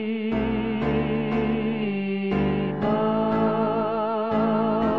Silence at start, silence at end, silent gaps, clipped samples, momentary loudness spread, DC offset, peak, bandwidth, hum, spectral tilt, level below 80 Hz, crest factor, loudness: 0 s; 0 s; none; under 0.1%; 3 LU; 0.4%; -10 dBFS; 5.2 kHz; none; -9.5 dB/octave; -44 dBFS; 12 dB; -24 LUFS